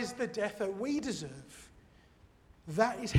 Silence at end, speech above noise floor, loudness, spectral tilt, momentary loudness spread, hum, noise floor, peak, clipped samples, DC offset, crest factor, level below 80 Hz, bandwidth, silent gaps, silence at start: 0 s; 29 dB; -35 LUFS; -5.5 dB/octave; 21 LU; none; -62 dBFS; -14 dBFS; under 0.1%; under 0.1%; 22 dB; -64 dBFS; 16 kHz; none; 0 s